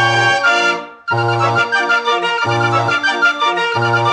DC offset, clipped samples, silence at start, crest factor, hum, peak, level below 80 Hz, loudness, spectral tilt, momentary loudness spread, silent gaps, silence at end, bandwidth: under 0.1%; under 0.1%; 0 s; 12 dB; none; -2 dBFS; -64 dBFS; -14 LUFS; -4 dB/octave; 5 LU; none; 0 s; 10.5 kHz